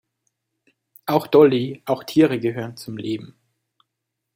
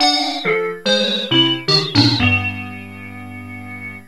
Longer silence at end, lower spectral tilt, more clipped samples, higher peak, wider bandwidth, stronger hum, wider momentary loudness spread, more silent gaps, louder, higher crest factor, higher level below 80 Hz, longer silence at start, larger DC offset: first, 1.1 s vs 0.05 s; first, -7 dB/octave vs -4.5 dB/octave; neither; about the same, -2 dBFS vs 0 dBFS; about the same, 16.5 kHz vs 15 kHz; neither; second, 16 LU vs 19 LU; neither; second, -20 LUFS vs -15 LUFS; about the same, 20 dB vs 18 dB; second, -66 dBFS vs -46 dBFS; first, 1.05 s vs 0 s; second, under 0.1% vs 0.5%